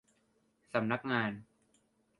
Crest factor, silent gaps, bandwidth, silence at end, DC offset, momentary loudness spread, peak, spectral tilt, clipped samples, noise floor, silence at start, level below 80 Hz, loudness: 24 dB; none; 11.5 kHz; 0.75 s; under 0.1%; 7 LU; -14 dBFS; -7 dB/octave; under 0.1%; -74 dBFS; 0.75 s; -76 dBFS; -35 LUFS